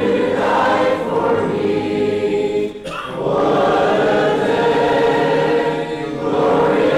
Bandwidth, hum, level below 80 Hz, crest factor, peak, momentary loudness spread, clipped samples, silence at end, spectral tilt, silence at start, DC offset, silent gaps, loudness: 12 kHz; none; -48 dBFS; 10 dB; -6 dBFS; 7 LU; under 0.1%; 0 s; -6 dB/octave; 0 s; 0.1%; none; -17 LUFS